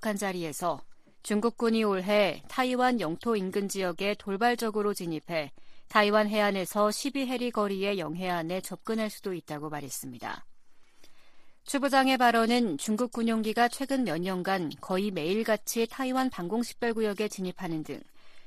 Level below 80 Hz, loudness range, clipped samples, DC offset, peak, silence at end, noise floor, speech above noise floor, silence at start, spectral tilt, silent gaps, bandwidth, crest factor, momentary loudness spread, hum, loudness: -64 dBFS; 6 LU; under 0.1%; under 0.1%; -8 dBFS; 0 s; -50 dBFS; 21 dB; 0 s; -4.5 dB/octave; none; 15 kHz; 22 dB; 12 LU; none; -29 LUFS